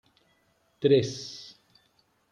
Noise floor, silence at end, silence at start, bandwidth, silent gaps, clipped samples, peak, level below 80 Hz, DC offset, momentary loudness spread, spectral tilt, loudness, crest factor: -69 dBFS; 0.9 s; 0.8 s; 9.4 kHz; none; under 0.1%; -10 dBFS; -72 dBFS; under 0.1%; 21 LU; -6 dB/octave; -26 LUFS; 20 dB